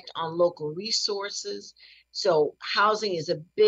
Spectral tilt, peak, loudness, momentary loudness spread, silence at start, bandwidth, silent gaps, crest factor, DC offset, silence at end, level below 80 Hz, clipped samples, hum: -3 dB/octave; -10 dBFS; -26 LUFS; 13 LU; 0.05 s; 8.4 kHz; none; 16 dB; under 0.1%; 0 s; -78 dBFS; under 0.1%; none